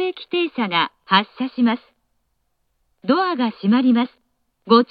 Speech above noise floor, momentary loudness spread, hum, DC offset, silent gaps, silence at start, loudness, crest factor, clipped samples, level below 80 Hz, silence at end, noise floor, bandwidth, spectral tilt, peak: 51 dB; 9 LU; none; under 0.1%; none; 0 s; -19 LUFS; 20 dB; under 0.1%; -72 dBFS; 0.05 s; -71 dBFS; 5 kHz; -8 dB/octave; 0 dBFS